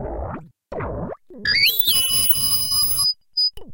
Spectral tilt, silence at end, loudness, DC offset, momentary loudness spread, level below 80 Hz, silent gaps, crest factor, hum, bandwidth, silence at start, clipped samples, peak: -0.5 dB/octave; 0 s; -16 LUFS; under 0.1%; 18 LU; -40 dBFS; none; 16 dB; none; 17 kHz; 0 s; under 0.1%; -4 dBFS